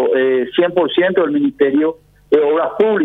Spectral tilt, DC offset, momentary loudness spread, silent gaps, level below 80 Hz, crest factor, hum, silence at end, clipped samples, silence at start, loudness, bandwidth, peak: -8 dB/octave; under 0.1%; 3 LU; none; -56 dBFS; 14 dB; none; 0 s; under 0.1%; 0 s; -15 LUFS; 4 kHz; 0 dBFS